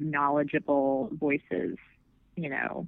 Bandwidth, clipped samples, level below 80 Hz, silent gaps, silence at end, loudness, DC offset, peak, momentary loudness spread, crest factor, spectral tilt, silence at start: 3.9 kHz; under 0.1%; -66 dBFS; none; 0 s; -29 LUFS; under 0.1%; -12 dBFS; 11 LU; 16 dB; -10.5 dB/octave; 0 s